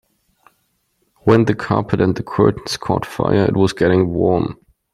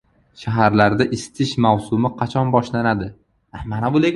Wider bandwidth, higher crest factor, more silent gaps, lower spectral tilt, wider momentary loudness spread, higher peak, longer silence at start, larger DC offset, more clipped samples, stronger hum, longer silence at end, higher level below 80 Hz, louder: first, 13 kHz vs 11.5 kHz; about the same, 16 dB vs 18 dB; neither; about the same, -7 dB/octave vs -6.5 dB/octave; second, 6 LU vs 12 LU; about the same, -2 dBFS vs 0 dBFS; first, 1.25 s vs 0.4 s; neither; neither; neither; first, 0.4 s vs 0 s; about the same, -46 dBFS vs -46 dBFS; about the same, -17 LUFS vs -19 LUFS